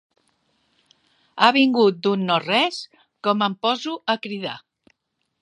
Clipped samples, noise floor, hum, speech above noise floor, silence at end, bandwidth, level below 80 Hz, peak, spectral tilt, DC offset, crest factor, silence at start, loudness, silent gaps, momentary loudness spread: under 0.1%; -76 dBFS; none; 56 dB; 0.85 s; 11 kHz; -76 dBFS; 0 dBFS; -5 dB/octave; under 0.1%; 22 dB; 1.35 s; -20 LUFS; none; 17 LU